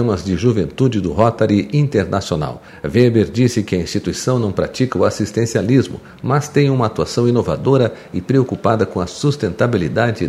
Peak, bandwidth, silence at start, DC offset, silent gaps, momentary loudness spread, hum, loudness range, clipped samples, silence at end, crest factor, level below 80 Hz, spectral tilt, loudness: 0 dBFS; 13.5 kHz; 0 s; under 0.1%; none; 5 LU; none; 1 LU; under 0.1%; 0 s; 16 dB; -42 dBFS; -6.5 dB/octave; -17 LUFS